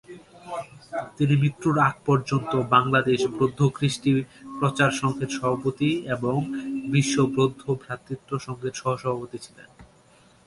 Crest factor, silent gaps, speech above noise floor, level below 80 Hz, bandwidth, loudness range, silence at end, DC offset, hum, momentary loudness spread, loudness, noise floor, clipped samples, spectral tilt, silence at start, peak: 20 dB; none; 32 dB; -58 dBFS; 11.5 kHz; 4 LU; 0.6 s; under 0.1%; none; 13 LU; -24 LUFS; -56 dBFS; under 0.1%; -6 dB/octave; 0.1 s; -4 dBFS